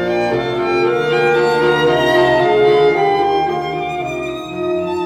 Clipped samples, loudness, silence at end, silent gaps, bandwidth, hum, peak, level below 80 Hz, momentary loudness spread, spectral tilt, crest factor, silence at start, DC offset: under 0.1%; -15 LUFS; 0 s; none; 13 kHz; none; -2 dBFS; -46 dBFS; 9 LU; -6 dB/octave; 12 dB; 0 s; under 0.1%